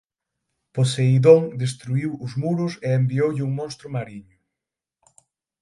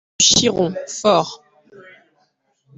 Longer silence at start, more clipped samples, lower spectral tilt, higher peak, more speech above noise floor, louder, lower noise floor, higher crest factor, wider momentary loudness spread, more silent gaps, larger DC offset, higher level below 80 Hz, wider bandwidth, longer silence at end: first, 0.75 s vs 0.2 s; neither; first, -7 dB/octave vs -2.5 dB/octave; about the same, -2 dBFS vs 0 dBFS; first, 67 dB vs 48 dB; second, -21 LUFS vs -16 LUFS; first, -87 dBFS vs -64 dBFS; about the same, 22 dB vs 20 dB; first, 16 LU vs 10 LU; neither; neither; second, -62 dBFS vs -54 dBFS; first, 11.5 kHz vs 8.4 kHz; about the same, 1.4 s vs 1.4 s